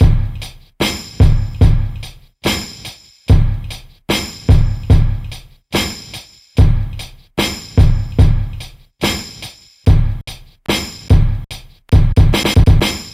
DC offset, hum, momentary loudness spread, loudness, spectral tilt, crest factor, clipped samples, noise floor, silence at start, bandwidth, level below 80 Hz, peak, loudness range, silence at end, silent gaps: under 0.1%; none; 19 LU; -16 LUFS; -5.5 dB/octave; 14 dB; under 0.1%; -35 dBFS; 0 s; 15.5 kHz; -18 dBFS; 0 dBFS; 3 LU; 0.05 s; none